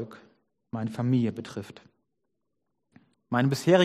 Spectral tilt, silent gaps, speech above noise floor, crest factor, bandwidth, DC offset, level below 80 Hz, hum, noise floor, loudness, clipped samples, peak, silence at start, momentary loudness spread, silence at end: -6.5 dB/octave; none; 56 dB; 20 dB; 13 kHz; under 0.1%; -70 dBFS; none; -81 dBFS; -28 LUFS; under 0.1%; -8 dBFS; 0 s; 16 LU; 0 s